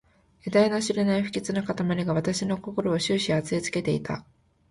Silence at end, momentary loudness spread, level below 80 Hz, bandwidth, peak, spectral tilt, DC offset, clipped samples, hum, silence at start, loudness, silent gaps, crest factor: 0.5 s; 6 LU; -56 dBFS; 11.5 kHz; -8 dBFS; -5.5 dB/octave; under 0.1%; under 0.1%; none; 0.45 s; -26 LUFS; none; 20 dB